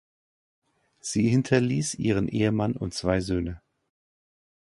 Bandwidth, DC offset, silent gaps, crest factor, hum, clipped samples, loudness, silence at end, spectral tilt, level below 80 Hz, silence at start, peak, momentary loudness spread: 11.5 kHz; under 0.1%; none; 22 dB; none; under 0.1%; -26 LUFS; 1.15 s; -6 dB/octave; -48 dBFS; 1.05 s; -6 dBFS; 9 LU